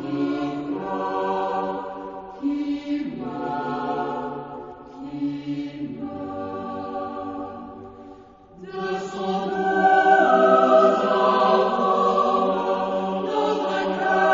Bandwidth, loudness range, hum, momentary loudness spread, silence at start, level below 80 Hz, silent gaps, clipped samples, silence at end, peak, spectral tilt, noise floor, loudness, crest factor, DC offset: 7.6 kHz; 13 LU; none; 18 LU; 0 s; -60 dBFS; none; under 0.1%; 0 s; -4 dBFS; -6 dB/octave; -46 dBFS; -22 LUFS; 18 dB; under 0.1%